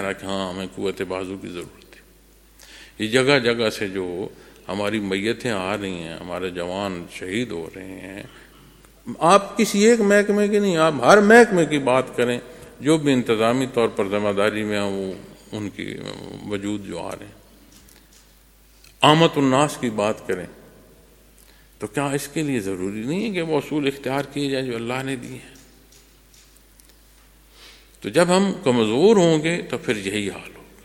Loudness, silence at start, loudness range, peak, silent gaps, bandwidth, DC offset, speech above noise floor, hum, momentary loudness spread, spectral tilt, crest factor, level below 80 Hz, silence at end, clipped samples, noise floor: -21 LUFS; 0 s; 14 LU; 0 dBFS; none; 17 kHz; under 0.1%; 32 dB; none; 18 LU; -5 dB/octave; 22 dB; -54 dBFS; 0.2 s; under 0.1%; -53 dBFS